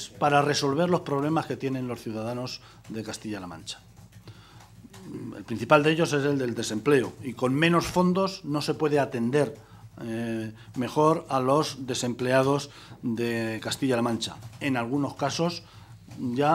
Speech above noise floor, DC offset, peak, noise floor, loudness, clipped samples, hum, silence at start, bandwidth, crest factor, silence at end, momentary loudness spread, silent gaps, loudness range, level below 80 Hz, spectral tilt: 24 dB; under 0.1%; -2 dBFS; -50 dBFS; -26 LUFS; under 0.1%; none; 0 s; 15.5 kHz; 24 dB; 0 s; 15 LU; none; 9 LU; -60 dBFS; -5.5 dB/octave